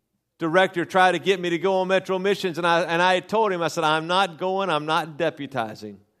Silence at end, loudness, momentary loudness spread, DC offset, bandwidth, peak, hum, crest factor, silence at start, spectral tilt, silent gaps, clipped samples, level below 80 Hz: 0.25 s; -22 LUFS; 10 LU; under 0.1%; 14 kHz; -4 dBFS; none; 20 dB; 0.4 s; -4.5 dB/octave; none; under 0.1%; -72 dBFS